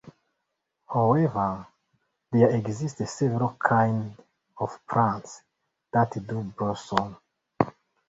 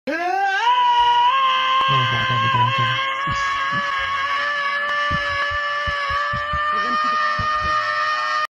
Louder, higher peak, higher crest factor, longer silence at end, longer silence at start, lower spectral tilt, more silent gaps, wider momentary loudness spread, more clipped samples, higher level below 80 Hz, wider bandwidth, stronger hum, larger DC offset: second, -26 LUFS vs -19 LUFS; first, -2 dBFS vs -8 dBFS; first, 24 dB vs 12 dB; first, 0.4 s vs 0.05 s; about the same, 0.05 s vs 0.05 s; first, -7 dB/octave vs -3.5 dB/octave; neither; first, 12 LU vs 5 LU; neither; second, -58 dBFS vs -44 dBFS; second, 8 kHz vs 11.5 kHz; neither; neither